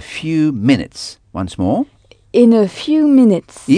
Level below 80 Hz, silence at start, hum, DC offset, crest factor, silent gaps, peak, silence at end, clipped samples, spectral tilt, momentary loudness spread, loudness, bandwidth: -48 dBFS; 0 s; none; under 0.1%; 14 dB; none; 0 dBFS; 0 s; under 0.1%; -6.5 dB/octave; 16 LU; -14 LUFS; 10 kHz